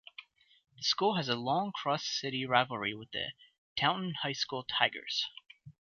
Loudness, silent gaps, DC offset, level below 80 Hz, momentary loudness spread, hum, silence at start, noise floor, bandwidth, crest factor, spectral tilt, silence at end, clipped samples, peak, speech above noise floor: -33 LUFS; 3.58-3.76 s; under 0.1%; -72 dBFS; 10 LU; none; 0.2 s; -56 dBFS; 7.4 kHz; 24 dB; -1.5 dB/octave; 0.15 s; under 0.1%; -10 dBFS; 22 dB